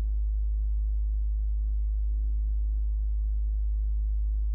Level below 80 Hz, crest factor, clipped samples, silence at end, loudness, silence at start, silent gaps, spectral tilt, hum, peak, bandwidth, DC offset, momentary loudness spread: -26 dBFS; 4 dB; under 0.1%; 0 s; -31 LUFS; 0 s; none; -15 dB/octave; none; -24 dBFS; 0.4 kHz; under 0.1%; 0 LU